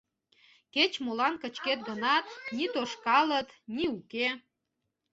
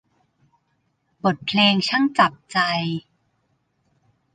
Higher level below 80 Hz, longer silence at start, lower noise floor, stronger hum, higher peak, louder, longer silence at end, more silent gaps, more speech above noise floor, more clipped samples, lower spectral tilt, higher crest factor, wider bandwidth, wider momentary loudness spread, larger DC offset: about the same, -70 dBFS vs -66 dBFS; second, 0.75 s vs 1.25 s; first, -83 dBFS vs -70 dBFS; neither; second, -10 dBFS vs -4 dBFS; second, -30 LUFS vs -20 LUFS; second, 0.75 s vs 1.35 s; neither; about the same, 53 dB vs 50 dB; neither; second, -3 dB/octave vs -5 dB/octave; about the same, 22 dB vs 20 dB; second, 8 kHz vs 9.4 kHz; about the same, 9 LU vs 8 LU; neither